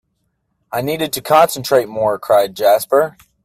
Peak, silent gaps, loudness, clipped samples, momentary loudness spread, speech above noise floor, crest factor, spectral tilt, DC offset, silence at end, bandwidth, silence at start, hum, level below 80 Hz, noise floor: 0 dBFS; none; -15 LUFS; under 0.1%; 9 LU; 53 dB; 16 dB; -4 dB/octave; under 0.1%; 0.35 s; 16 kHz; 0.7 s; none; -58 dBFS; -68 dBFS